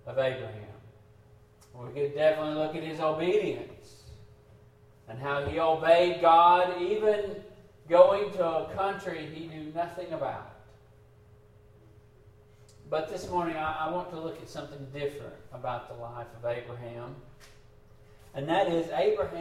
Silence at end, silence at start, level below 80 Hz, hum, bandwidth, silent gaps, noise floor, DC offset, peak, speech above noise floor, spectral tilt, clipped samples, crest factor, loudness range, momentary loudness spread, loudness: 0 s; 0.05 s; -60 dBFS; none; 13 kHz; none; -57 dBFS; under 0.1%; -6 dBFS; 29 dB; -6 dB/octave; under 0.1%; 24 dB; 16 LU; 21 LU; -28 LUFS